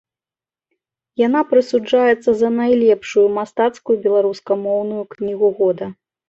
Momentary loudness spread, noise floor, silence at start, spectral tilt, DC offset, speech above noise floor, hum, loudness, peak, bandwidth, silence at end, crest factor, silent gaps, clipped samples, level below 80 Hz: 10 LU; under -90 dBFS; 1.2 s; -6 dB/octave; under 0.1%; over 74 dB; none; -17 LUFS; -2 dBFS; 7.8 kHz; 0.35 s; 14 dB; none; under 0.1%; -60 dBFS